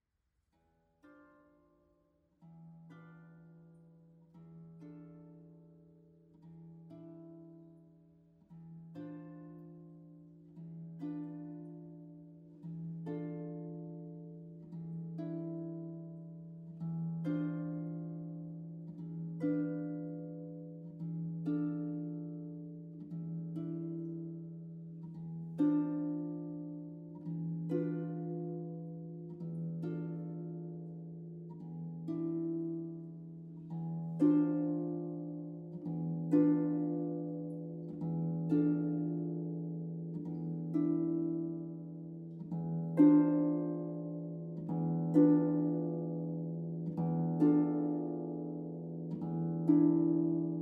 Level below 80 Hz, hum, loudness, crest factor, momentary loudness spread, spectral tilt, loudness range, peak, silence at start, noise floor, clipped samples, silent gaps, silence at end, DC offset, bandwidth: -80 dBFS; none; -36 LUFS; 22 dB; 22 LU; -12 dB/octave; 21 LU; -16 dBFS; 1.05 s; -82 dBFS; under 0.1%; none; 0 s; under 0.1%; 2.8 kHz